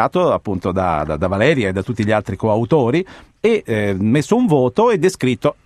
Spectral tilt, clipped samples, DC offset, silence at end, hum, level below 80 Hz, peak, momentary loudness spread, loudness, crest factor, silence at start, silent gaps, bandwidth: -7 dB/octave; under 0.1%; under 0.1%; 0.15 s; none; -44 dBFS; 0 dBFS; 6 LU; -17 LUFS; 16 dB; 0 s; none; 14 kHz